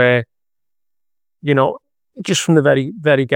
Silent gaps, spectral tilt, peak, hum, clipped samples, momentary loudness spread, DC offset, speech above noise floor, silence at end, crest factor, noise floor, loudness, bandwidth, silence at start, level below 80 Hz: none; -5 dB/octave; 0 dBFS; none; under 0.1%; 16 LU; under 0.1%; 73 dB; 0 s; 18 dB; -88 dBFS; -16 LUFS; 17 kHz; 0 s; -64 dBFS